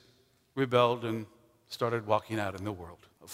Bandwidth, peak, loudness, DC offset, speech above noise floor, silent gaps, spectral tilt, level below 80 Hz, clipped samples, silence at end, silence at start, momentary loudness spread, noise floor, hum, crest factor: 16 kHz; -10 dBFS; -31 LUFS; under 0.1%; 36 dB; none; -6 dB/octave; -68 dBFS; under 0.1%; 0 s; 0.55 s; 19 LU; -66 dBFS; none; 24 dB